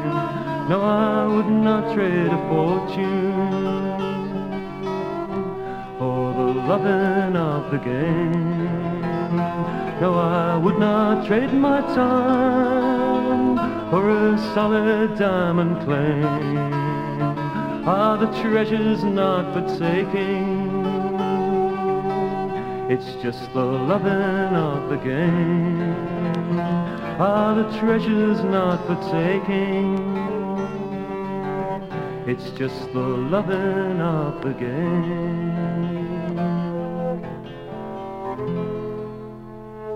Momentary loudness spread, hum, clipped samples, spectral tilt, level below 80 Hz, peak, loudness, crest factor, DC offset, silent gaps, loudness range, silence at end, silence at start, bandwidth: 9 LU; none; under 0.1%; -8.5 dB/octave; -52 dBFS; -4 dBFS; -22 LUFS; 16 dB; under 0.1%; none; 6 LU; 0 s; 0 s; 7.8 kHz